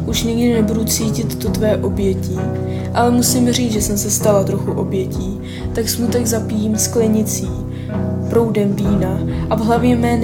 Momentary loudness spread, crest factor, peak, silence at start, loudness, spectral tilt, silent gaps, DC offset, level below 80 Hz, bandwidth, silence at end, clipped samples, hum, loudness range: 7 LU; 16 dB; 0 dBFS; 0 s; -17 LUFS; -5.5 dB/octave; none; under 0.1%; -32 dBFS; 17.5 kHz; 0 s; under 0.1%; none; 2 LU